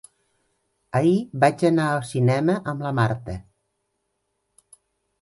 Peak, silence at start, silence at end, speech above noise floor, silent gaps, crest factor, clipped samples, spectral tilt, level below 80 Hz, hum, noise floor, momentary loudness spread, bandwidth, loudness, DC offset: -4 dBFS; 0.95 s; 1.8 s; 54 dB; none; 20 dB; under 0.1%; -7 dB/octave; -54 dBFS; none; -75 dBFS; 9 LU; 11.5 kHz; -22 LUFS; under 0.1%